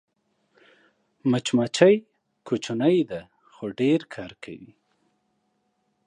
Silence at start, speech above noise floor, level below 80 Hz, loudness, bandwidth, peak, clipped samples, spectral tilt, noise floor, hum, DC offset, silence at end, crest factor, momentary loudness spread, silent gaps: 1.25 s; 50 dB; -68 dBFS; -23 LUFS; 10.5 kHz; -2 dBFS; under 0.1%; -5.5 dB/octave; -72 dBFS; none; under 0.1%; 1.4 s; 24 dB; 20 LU; none